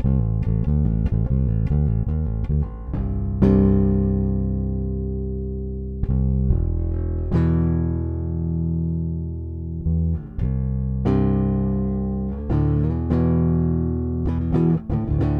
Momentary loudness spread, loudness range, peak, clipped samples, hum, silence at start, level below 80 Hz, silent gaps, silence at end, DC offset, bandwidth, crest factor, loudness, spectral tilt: 8 LU; 3 LU; -4 dBFS; under 0.1%; none; 0 s; -26 dBFS; none; 0 s; under 0.1%; 4.1 kHz; 18 dB; -22 LUFS; -12 dB/octave